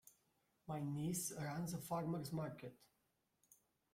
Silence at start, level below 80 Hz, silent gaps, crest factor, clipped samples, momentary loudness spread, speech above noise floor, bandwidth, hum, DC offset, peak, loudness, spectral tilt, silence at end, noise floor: 0.05 s; -76 dBFS; none; 16 dB; under 0.1%; 12 LU; 40 dB; 16.5 kHz; none; under 0.1%; -32 dBFS; -45 LUFS; -5.5 dB/octave; 1.15 s; -84 dBFS